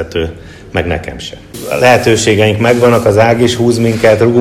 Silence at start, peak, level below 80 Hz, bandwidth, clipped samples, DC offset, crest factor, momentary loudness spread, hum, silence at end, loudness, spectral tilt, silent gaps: 0 s; 0 dBFS; -34 dBFS; 16 kHz; 1%; under 0.1%; 10 dB; 14 LU; none; 0 s; -10 LUFS; -5.5 dB/octave; none